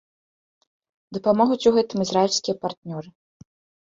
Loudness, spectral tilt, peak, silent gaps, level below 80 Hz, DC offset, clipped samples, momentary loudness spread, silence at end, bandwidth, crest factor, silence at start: -21 LUFS; -5 dB/octave; -4 dBFS; 2.77-2.82 s; -64 dBFS; under 0.1%; under 0.1%; 17 LU; 0.75 s; 7.8 kHz; 20 dB; 1.1 s